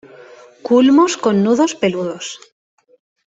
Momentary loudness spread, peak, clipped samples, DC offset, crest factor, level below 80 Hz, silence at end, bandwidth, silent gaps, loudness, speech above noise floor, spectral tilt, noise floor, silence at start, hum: 18 LU; -2 dBFS; under 0.1%; under 0.1%; 16 dB; -60 dBFS; 1 s; 8 kHz; none; -14 LUFS; 27 dB; -5 dB/octave; -41 dBFS; 0.65 s; none